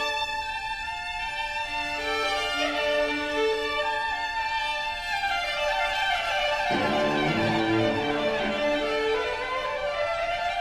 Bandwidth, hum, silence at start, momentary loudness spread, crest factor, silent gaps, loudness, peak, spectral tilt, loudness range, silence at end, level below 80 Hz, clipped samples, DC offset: 14 kHz; none; 0 s; 5 LU; 14 dB; none; -26 LUFS; -12 dBFS; -4 dB/octave; 2 LU; 0 s; -48 dBFS; under 0.1%; under 0.1%